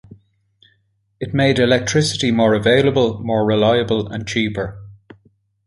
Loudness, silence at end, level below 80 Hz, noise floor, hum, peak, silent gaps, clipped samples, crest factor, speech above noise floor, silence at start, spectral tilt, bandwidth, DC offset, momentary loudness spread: -17 LUFS; 0.75 s; -46 dBFS; -64 dBFS; none; -2 dBFS; none; under 0.1%; 16 dB; 47 dB; 0.1 s; -5 dB/octave; 11.5 kHz; under 0.1%; 9 LU